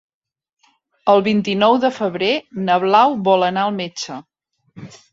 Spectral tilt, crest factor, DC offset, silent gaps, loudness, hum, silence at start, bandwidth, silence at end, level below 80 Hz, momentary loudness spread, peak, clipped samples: -5.5 dB/octave; 16 dB; under 0.1%; none; -17 LUFS; none; 1.05 s; 7.8 kHz; 0.25 s; -62 dBFS; 12 LU; -2 dBFS; under 0.1%